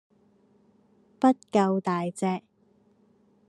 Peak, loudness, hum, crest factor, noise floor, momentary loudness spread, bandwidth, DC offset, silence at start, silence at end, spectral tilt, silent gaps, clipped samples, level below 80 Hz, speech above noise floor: -8 dBFS; -26 LUFS; none; 22 dB; -64 dBFS; 7 LU; 11 kHz; under 0.1%; 1.2 s; 1.1 s; -7 dB/octave; none; under 0.1%; -78 dBFS; 39 dB